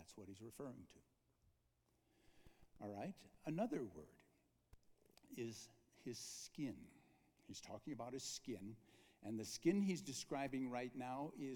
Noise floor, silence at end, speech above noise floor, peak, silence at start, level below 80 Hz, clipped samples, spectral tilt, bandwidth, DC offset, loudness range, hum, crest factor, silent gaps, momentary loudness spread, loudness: -82 dBFS; 0 s; 34 dB; -26 dBFS; 0 s; -80 dBFS; under 0.1%; -5 dB/octave; 19 kHz; under 0.1%; 9 LU; none; 24 dB; none; 17 LU; -48 LUFS